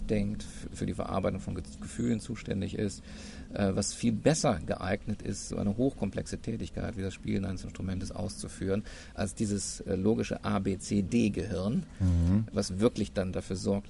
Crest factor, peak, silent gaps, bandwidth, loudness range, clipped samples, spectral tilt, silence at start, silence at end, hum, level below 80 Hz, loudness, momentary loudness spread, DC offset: 22 dB; -10 dBFS; none; 11.5 kHz; 5 LU; under 0.1%; -6 dB/octave; 0 s; 0 s; none; -44 dBFS; -32 LUFS; 9 LU; under 0.1%